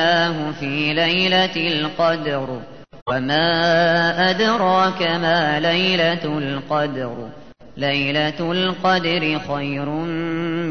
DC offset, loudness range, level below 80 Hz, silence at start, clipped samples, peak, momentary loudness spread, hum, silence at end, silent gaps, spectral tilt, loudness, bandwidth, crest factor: 0.7%; 4 LU; -54 dBFS; 0 s; under 0.1%; -4 dBFS; 9 LU; none; 0 s; 3.02-3.06 s; -5.5 dB/octave; -19 LUFS; 6.6 kHz; 16 dB